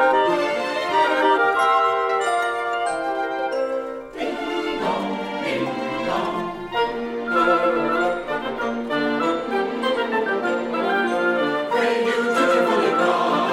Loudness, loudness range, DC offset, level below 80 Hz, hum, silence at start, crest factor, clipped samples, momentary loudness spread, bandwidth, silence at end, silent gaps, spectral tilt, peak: -21 LUFS; 5 LU; under 0.1%; -54 dBFS; none; 0 s; 16 dB; under 0.1%; 8 LU; 15.5 kHz; 0 s; none; -4.5 dB/octave; -6 dBFS